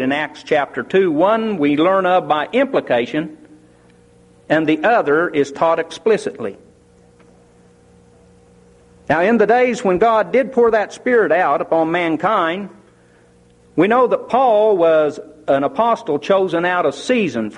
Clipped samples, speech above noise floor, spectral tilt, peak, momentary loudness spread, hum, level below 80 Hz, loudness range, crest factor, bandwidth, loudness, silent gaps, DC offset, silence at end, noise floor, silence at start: under 0.1%; 34 dB; -6 dB/octave; -2 dBFS; 6 LU; none; -56 dBFS; 6 LU; 14 dB; 10.5 kHz; -16 LUFS; none; under 0.1%; 0 s; -50 dBFS; 0 s